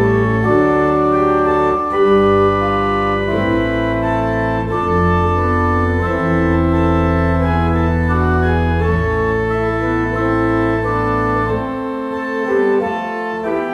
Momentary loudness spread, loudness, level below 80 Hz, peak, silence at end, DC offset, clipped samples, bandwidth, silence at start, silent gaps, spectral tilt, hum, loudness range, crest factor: 5 LU; -16 LUFS; -28 dBFS; -2 dBFS; 0 s; under 0.1%; under 0.1%; 9.4 kHz; 0 s; none; -8.5 dB/octave; none; 3 LU; 12 dB